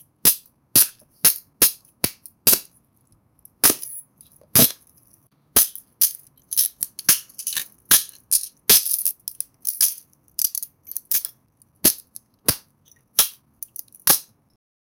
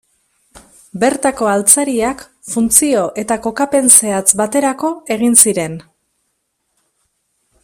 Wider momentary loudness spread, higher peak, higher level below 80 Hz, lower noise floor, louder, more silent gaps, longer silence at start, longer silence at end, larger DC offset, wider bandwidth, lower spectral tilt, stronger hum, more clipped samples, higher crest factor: first, 16 LU vs 13 LU; about the same, 0 dBFS vs 0 dBFS; about the same, -54 dBFS vs -52 dBFS; second, -61 dBFS vs -68 dBFS; second, -19 LUFS vs -12 LUFS; neither; second, 0.25 s vs 0.55 s; second, 0.75 s vs 1.85 s; neither; about the same, over 20 kHz vs over 20 kHz; second, -0.5 dB/octave vs -2.5 dB/octave; neither; second, under 0.1% vs 0.3%; first, 24 dB vs 16 dB